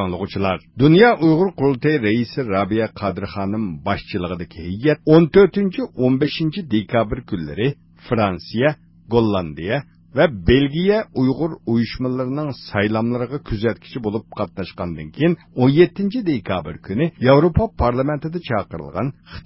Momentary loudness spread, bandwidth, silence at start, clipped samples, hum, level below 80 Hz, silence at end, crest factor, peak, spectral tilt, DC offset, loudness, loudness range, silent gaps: 12 LU; 5.8 kHz; 0 s; under 0.1%; none; -38 dBFS; 0.05 s; 18 dB; 0 dBFS; -11.5 dB/octave; under 0.1%; -19 LUFS; 5 LU; none